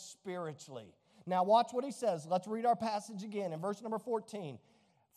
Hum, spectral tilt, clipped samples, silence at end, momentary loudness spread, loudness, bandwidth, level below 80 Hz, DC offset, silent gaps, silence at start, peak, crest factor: none; -5.5 dB/octave; under 0.1%; 0.6 s; 19 LU; -36 LUFS; 13.5 kHz; -86 dBFS; under 0.1%; none; 0 s; -16 dBFS; 20 dB